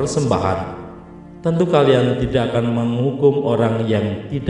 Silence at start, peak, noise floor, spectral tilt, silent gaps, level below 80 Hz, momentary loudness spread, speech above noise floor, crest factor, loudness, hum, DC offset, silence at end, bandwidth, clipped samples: 0 s; -2 dBFS; -38 dBFS; -7 dB/octave; none; -42 dBFS; 11 LU; 21 dB; 16 dB; -18 LUFS; none; under 0.1%; 0 s; 11 kHz; under 0.1%